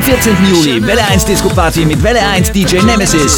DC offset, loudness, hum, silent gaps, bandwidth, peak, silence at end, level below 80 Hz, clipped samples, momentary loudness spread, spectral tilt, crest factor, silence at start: under 0.1%; -9 LUFS; none; none; 18.5 kHz; 0 dBFS; 0 s; -22 dBFS; 0.4%; 2 LU; -4 dB/octave; 10 dB; 0 s